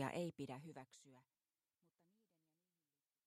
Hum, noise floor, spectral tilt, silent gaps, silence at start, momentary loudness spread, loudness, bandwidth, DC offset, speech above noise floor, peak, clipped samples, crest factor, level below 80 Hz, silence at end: none; under -90 dBFS; -6 dB/octave; none; 0 s; 20 LU; -50 LUFS; 14.5 kHz; under 0.1%; over 34 dB; -30 dBFS; under 0.1%; 24 dB; under -90 dBFS; 2.05 s